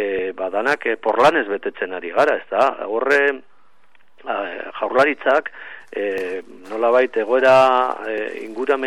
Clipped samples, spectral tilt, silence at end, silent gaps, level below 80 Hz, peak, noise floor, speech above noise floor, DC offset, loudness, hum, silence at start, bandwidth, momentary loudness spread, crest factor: under 0.1%; -4.5 dB/octave; 0 s; none; -62 dBFS; -4 dBFS; -59 dBFS; 40 dB; 0.6%; -19 LUFS; none; 0 s; 12 kHz; 13 LU; 14 dB